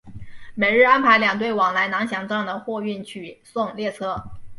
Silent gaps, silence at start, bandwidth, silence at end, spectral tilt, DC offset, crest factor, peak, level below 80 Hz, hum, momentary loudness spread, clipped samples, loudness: none; 0.05 s; 11.5 kHz; 0 s; -5 dB/octave; under 0.1%; 18 dB; -4 dBFS; -52 dBFS; none; 18 LU; under 0.1%; -20 LUFS